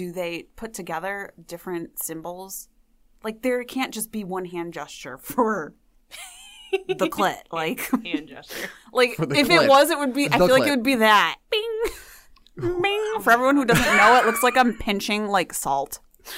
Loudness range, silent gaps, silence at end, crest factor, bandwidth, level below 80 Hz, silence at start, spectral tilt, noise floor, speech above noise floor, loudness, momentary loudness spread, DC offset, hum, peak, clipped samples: 12 LU; none; 0 s; 18 dB; 16 kHz; -50 dBFS; 0 s; -3.5 dB/octave; -58 dBFS; 36 dB; -21 LUFS; 19 LU; under 0.1%; none; -4 dBFS; under 0.1%